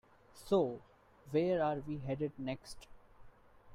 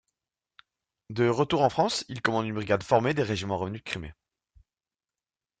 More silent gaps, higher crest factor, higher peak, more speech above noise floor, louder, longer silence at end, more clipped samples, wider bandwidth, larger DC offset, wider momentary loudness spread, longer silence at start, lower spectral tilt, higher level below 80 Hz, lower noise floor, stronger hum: neither; about the same, 18 dB vs 22 dB; second, -20 dBFS vs -6 dBFS; second, 23 dB vs over 63 dB; second, -36 LUFS vs -27 LUFS; second, 0 s vs 1.5 s; neither; first, 15.5 kHz vs 9.4 kHz; neither; first, 19 LU vs 12 LU; second, 0.35 s vs 1.1 s; first, -7 dB/octave vs -5.5 dB/octave; about the same, -62 dBFS vs -60 dBFS; second, -58 dBFS vs under -90 dBFS; neither